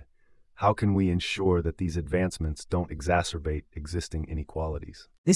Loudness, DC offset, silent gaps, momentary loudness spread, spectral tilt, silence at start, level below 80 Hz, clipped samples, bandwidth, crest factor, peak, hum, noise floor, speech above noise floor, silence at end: -29 LUFS; under 0.1%; 5.18-5.24 s; 9 LU; -6 dB/octave; 0 s; -42 dBFS; under 0.1%; 12 kHz; 18 dB; -10 dBFS; none; -59 dBFS; 32 dB; 0 s